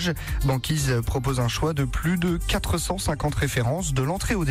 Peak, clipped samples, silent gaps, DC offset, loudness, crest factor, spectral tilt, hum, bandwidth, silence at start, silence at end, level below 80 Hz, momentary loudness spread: -14 dBFS; under 0.1%; none; under 0.1%; -25 LUFS; 10 dB; -5 dB/octave; none; 16 kHz; 0 s; 0 s; -32 dBFS; 2 LU